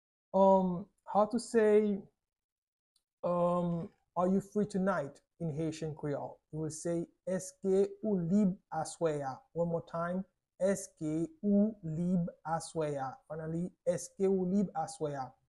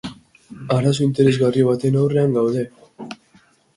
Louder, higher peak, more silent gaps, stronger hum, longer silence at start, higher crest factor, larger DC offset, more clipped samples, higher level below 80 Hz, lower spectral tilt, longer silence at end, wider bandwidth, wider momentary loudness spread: second, -34 LUFS vs -18 LUFS; second, -16 dBFS vs -4 dBFS; first, 2.44-2.95 s, 3.13-3.23 s vs none; neither; first, 0.35 s vs 0.05 s; about the same, 18 dB vs 16 dB; neither; neither; second, -68 dBFS vs -56 dBFS; about the same, -7 dB/octave vs -7.5 dB/octave; second, 0.2 s vs 0.6 s; about the same, 12 kHz vs 11.5 kHz; second, 11 LU vs 20 LU